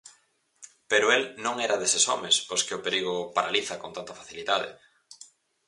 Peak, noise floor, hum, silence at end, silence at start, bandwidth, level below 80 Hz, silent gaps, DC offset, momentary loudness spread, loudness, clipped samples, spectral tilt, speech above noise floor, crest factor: -8 dBFS; -66 dBFS; none; 0.45 s; 0.05 s; 11.5 kHz; -72 dBFS; none; under 0.1%; 15 LU; -25 LUFS; under 0.1%; -0.5 dB/octave; 39 dB; 22 dB